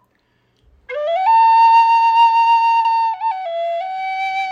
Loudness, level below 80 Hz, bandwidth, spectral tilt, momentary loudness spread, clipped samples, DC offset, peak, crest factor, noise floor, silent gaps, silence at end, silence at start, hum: -14 LUFS; -64 dBFS; 6.8 kHz; 0 dB/octave; 12 LU; under 0.1%; under 0.1%; -4 dBFS; 10 dB; -62 dBFS; none; 0 s; 0.9 s; none